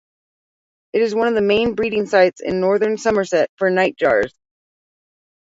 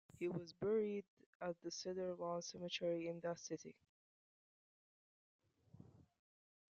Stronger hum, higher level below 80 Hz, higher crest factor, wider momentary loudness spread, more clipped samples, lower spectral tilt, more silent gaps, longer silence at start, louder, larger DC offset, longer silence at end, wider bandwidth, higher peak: neither; first, -52 dBFS vs -84 dBFS; about the same, 18 dB vs 18 dB; second, 5 LU vs 10 LU; neither; about the same, -5 dB/octave vs -4.5 dB/octave; second, 3.49-3.57 s vs 1.08-1.17 s, 1.26-1.40 s, 3.89-5.39 s; first, 0.95 s vs 0.15 s; first, -18 LUFS vs -45 LUFS; neither; first, 1.15 s vs 0.7 s; about the same, 8 kHz vs 7.6 kHz; first, -2 dBFS vs -30 dBFS